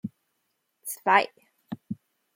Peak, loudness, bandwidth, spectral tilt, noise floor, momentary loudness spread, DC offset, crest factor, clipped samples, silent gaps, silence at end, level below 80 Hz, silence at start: -6 dBFS; -25 LUFS; 16.5 kHz; -3.5 dB/octave; -77 dBFS; 20 LU; under 0.1%; 24 dB; under 0.1%; none; 0.4 s; -80 dBFS; 0.05 s